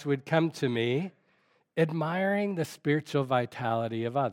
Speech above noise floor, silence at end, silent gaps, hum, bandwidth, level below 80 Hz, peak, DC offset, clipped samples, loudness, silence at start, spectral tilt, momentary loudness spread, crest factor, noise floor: 40 dB; 0 s; none; none; 16.5 kHz; -78 dBFS; -10 dBFS; under 0.1%; under 0.1%; -29 LUFS; 0 s; -7 dB/octave; 4 LU; 20 dB; -69 dBFS